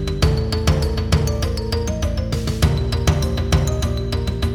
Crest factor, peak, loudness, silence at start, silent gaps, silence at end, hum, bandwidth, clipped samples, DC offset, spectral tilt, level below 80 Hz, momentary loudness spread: 18 dB; -2 dBFS; -20 LUFS; 0 s; none; 0 s; none; 16.5 kHz; under 0.1%; under 0.1%; -5.5 dB/octave; -24 dBFS; 4 LU